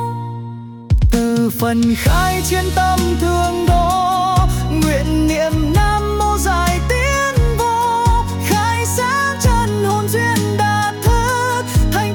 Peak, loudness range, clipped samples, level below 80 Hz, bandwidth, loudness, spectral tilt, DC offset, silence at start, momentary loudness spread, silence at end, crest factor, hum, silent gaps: -4 dBFS; 1 LU; under 0.1%; -22 dBFS; 19 kHz; -16 LUFS; -5 dB/octave; under 0.1%; 0 s; 2 LU; 0 s; 12 dB; none; none